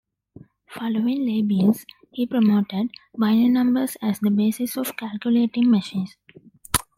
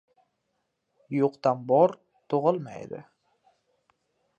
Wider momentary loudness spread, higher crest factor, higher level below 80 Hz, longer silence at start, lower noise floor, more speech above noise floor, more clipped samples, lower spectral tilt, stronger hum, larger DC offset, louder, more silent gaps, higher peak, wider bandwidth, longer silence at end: second, 11 LU vs 19 LU; about the same, 22 dB vs 20 dB; first, -54 dBFS vs -78 dBFS; second, 0.7 s vs 1.1 s; second, -49 dBFS vs -78 dBFS; second, 28 dB vs 53 dB; neither; second, -5.5 dB/octave vs -8.5 dB/octave; neither; neither; first, -22 LUFS vs -26 LUFS; neither; first, 0 dBFS vs -8 dBFS; first, 16.5 kHz vs 7.4 kHz; second, 0.15 s vs 1.35 s